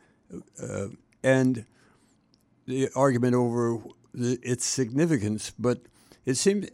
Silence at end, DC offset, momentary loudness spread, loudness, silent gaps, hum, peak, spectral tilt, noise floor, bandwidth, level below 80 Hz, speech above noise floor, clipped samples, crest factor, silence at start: 0.05 s; under 0.1%; 16 LU; -27 LUFS; none; none; -10 dBFS; -5.5 dB/octave; -65 dBFS; 15.5 kHz; -64 dBFS; 39 dB; under 0.1%; 18 dB; 0.3 s